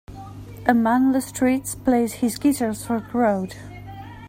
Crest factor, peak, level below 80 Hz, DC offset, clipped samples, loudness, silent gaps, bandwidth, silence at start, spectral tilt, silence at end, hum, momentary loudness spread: 20 dB; -2 dBFS; -48 dBFS; under 0.1%; under 0.1%; -21 LUFS; none; 16.5 kHz; 0.1 s; -5.5 dB/octave; 0 s; 50 Hz at -45 dBFS; 20 LU